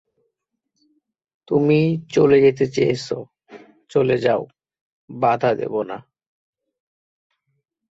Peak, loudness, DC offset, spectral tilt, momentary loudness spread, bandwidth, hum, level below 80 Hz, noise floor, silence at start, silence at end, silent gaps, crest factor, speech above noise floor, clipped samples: -2 dBFS; -19 LUFS; under 0.1%; -7 dB/octave; 15 LU; 8 kHz; none; -60 dBFS; -77 dBFS; 1.5 s; 1.9 s; 4.81-5.08 s; 18 dB; 59 dB; under 0.1%